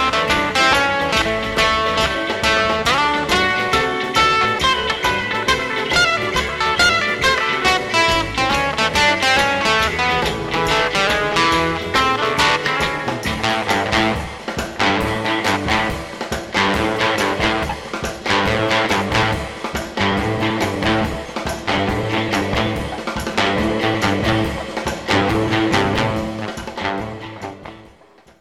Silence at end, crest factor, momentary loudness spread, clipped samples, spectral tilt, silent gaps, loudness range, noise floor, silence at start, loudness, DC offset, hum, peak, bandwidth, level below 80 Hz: 0.55 s; 18 dB; 10 LU; under 0.1%; -3.5 dB/octave; none; 4 LU; -48 dBFS; 0 s; -17 LUFS; 0.1%; none; 0 dBFS; 16.5 kHz; -36 dBFS